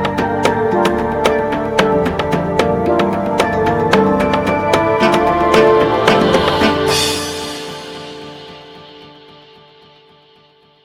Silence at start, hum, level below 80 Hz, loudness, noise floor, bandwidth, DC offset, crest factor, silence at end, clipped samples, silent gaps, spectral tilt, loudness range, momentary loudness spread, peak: 0 s; none; -40 dBFS; -14 LUFS; -50 dBFS; 17 kHz; under 0.1%; 16 dB; 1.75 s; under 0.1%; none; -5 dB/octave; 10 LU; 16 LU; 0 dBFS